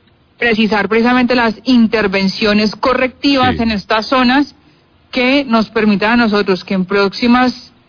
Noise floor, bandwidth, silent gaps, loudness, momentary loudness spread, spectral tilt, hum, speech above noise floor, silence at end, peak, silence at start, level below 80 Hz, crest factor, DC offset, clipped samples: -49 dBFS; 5.4 kHz; none; -13 LUFS; 4 LU; -6 dB/octave; none; 37 dB; 0.25 s; 0 dBFS; 0.4 s; -42 dBFS; 12 dB; under 0.1%; under 0.1%